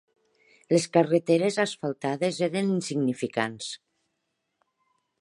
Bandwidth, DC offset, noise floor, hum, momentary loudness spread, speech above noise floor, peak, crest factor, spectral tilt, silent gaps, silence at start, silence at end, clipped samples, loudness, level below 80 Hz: 11.5 kHz; under 0.1%; -79 dBFS; none; 9 LU; 54 dB; -6 dBFS; 22 dB; -5.5 dB/octave; none; 0.7 s; 1.45 s; under 0.1%; -26 LUFS; -74 dBFS